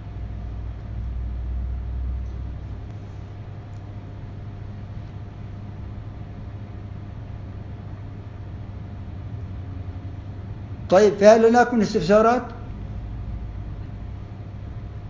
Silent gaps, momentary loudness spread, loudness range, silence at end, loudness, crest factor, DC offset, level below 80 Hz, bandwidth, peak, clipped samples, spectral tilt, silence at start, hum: none; 20 LU; 18 LU; 0 s; -22 LUFS; 24 dB; under 0.1%; -36 dBFS; 7.6 kHz; 0 dBFS; under 0.1%; -7 dB/octave; 0 s; none